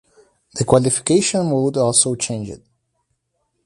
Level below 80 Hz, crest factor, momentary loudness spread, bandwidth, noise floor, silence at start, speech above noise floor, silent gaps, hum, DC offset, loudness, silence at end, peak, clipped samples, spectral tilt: -50 dBFS; 20 dB; 13 LU; 11.5 kHz; -71 dBFS; 0.55 s; 53 dB; none; none; under 0.1%; -17 LUFS; 1.1 s; 0 dBFS; under 0.1%; -4.5 dB/octave